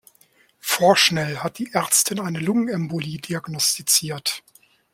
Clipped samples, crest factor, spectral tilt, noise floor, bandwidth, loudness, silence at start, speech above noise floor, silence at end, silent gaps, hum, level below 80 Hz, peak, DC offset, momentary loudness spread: under 0.1%; 20 dB; -2.5 dB/octave; -58 dBFS; 16.5 kHz; -20 LUFS; 0.65 s; 37 dB; 0.55 s; none; none; -62 dBFS; -2 dBFS; under 0.1%; 12 LU